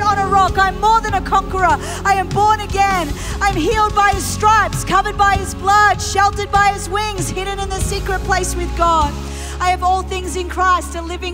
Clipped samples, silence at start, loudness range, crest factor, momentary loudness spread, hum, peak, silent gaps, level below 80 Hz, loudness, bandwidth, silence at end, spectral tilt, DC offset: under 0.1%; 0 s; 4 LU; 14 dB; 8 LU; none; -2 dBFS; none; -26 dBFS; -16 LUFS; 16 kHz; 0 s; -4 dB/octave; under 0.1%